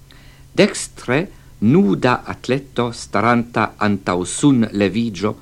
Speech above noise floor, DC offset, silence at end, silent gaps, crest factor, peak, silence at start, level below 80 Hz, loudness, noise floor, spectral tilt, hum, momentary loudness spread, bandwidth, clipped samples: 26 dB; under 0.1%; 0.05 s; none; 18 dB; 0 dBFS; 0.55 s; -46 dBFS; -18 LUFS; -43 dBFS; -5.5 dB/octave; none; 8 LU; 12.5 kHz; under 0.1%